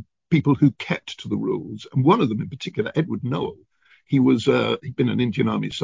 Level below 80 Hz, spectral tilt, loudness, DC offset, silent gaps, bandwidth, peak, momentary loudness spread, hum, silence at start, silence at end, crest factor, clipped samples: -56 dBFS; -7.5 dB/octave; -22 LUFS; under 0.1%; none; 7.6 kHz; -4 dBFS; 10 LU; none; 0 s; 0 s; 18 dB; under 0.1%